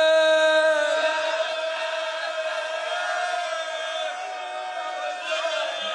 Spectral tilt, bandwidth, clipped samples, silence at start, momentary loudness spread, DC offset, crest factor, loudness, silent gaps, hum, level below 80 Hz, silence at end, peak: 1 dB/octave; 11 kHz; under 0.1%; 0 s; 12 LU; under 0.1%; 16 dB; -24 LUFS; none; none; -84 dBFS; 0 s; -8 dBFS